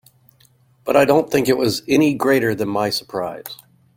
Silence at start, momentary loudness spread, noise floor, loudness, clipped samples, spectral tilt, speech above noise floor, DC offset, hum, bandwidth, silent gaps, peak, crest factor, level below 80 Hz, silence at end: 0.85 s; 17 LU; -55 dBFS; -18 LUFS; under 0.1%; -5 dB/octave; 38 dB; under 0.1%; none; 16.5 kHz; none; -2 dBFS; 18 dB; -56 dBFS; 0.45 s